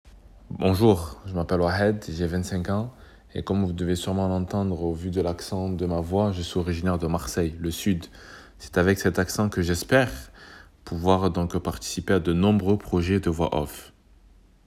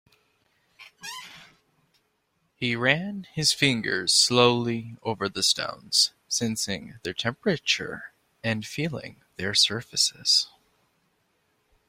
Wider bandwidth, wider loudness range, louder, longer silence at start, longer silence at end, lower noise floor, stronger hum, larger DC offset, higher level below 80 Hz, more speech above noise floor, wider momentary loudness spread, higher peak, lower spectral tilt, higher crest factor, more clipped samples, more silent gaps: about the same, 16 kHz vs 16.5 kHz; second, 3 LU vs 6 LU; about the same, -25 LUFS vs -24 LUFS; second, 0.05 s vs 0.8 s; second, 0.75 s vs 1.4 s; second, -54 dBFS vs -73 dBFS; neither; neither; first, -42 dBFS vs -64 dBFS; second, 30 dB vs 47 dB; second, 13 LU vs 17 LU; second, -6 dBFS vs -2 dBFS; first, -6 dB/octave vs -2.5 dB/octave; second, 20 dB vs 26 dB; neither; neither